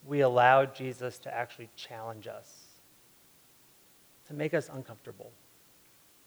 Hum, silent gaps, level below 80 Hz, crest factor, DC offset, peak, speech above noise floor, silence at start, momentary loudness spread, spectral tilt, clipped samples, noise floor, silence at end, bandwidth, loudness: none; none; -80 dBFS; 24 dB; under 0.1%; -8 dBFS; 31 dB; 0.05 s; 25 LU; -5.5 dB/octave; under 0.1%; -61 dBFS; 0.95 s; over 20 kHz; -29 LUFS